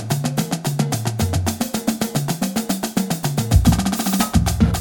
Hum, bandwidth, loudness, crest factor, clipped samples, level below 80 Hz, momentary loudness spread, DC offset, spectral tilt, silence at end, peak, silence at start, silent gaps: none; over 20 kHz; -20 LUFS; 16 dB; under 0.1%; -28 dBFS; 6 LU; under 0.1%; -5 dB/octave; 0 s; -2 dBFS; 0 s; none